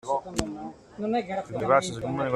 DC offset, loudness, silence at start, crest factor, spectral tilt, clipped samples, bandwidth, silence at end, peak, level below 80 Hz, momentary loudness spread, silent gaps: under 0.1%; -28 LUFS; 0.05 s; 22 dB; -5 dB/octave; under 0.1%; 13 kHz; 0 s; -6 dBFS; -52 dBFS; 13 LU; none